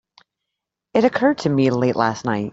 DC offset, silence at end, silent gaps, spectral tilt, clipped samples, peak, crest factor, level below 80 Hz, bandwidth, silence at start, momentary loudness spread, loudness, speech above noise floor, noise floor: under 0.1%; 0 s; none; -6.5 dB/octave; under 0.1%; -2 dBFS; 18 dB; -58 dBFS; 7.8 kHz; 0.95 s; 5 LU; -19 LUFS; 64 dB; -82 dBFS